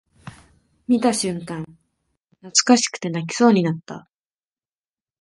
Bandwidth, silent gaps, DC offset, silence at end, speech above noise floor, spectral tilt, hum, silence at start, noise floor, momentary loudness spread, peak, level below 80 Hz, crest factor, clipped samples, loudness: 11.5 kHz; 2.24-2.28 s; under 0.1%; 1.2 s; over 70 dB; -4 dB/octave; none; 0.25 s; under -90 dBFS; 22 LU; 0 dBFS; -62 dBFS; 22 dB; under 0.1%; -19 LUFS